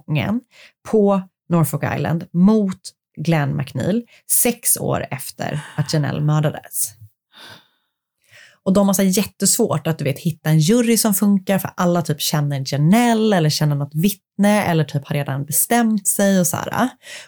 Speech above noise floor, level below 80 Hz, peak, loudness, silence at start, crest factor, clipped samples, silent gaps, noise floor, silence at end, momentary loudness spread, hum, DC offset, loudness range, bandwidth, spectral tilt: 53 dB; -56 dBFS; -4 dBFS; -18 LUFS; 0.1 s; 14 dB; under 0.1%; none; -71 dBFS; 0 s; 9 LU; none; under 0.1%; 5 LU; over 20 kHz; -5 dB/octave